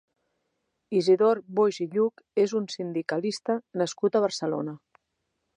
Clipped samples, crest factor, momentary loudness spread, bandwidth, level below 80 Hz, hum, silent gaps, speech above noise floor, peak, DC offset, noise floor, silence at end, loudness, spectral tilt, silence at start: under 0.1%; 16 dB; 9 LU; 10.5 kHz; -82 dBFS; none; none; 54 dB; -10 dBFS; under 0.1%; -79 dBFS; 0.8 s; -26 LUFS; -5.5 dB/octave; 0.9 s